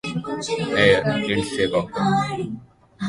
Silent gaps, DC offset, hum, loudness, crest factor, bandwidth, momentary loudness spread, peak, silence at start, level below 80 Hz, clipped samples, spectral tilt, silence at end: none; under 0.1%; none; -21 LUFS; 20 dB; 11.5 kHz; 12 LU; -2 dBFS; 0.05 s; -50 dBFS; under 0.1%; -5 dB/octave; 0 s